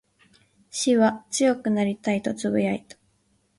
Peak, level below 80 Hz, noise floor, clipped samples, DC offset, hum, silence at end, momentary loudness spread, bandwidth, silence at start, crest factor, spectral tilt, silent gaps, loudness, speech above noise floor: -8 dBFS; -64 dBFS; -67 dBFS; under 0.1%; under 0.1%; none; 0.8 s; 7 LU; 11.5 kHz; 0.75 s; 16 dB; -4.5 dB/octave; none; -24 LUFS; 44 dB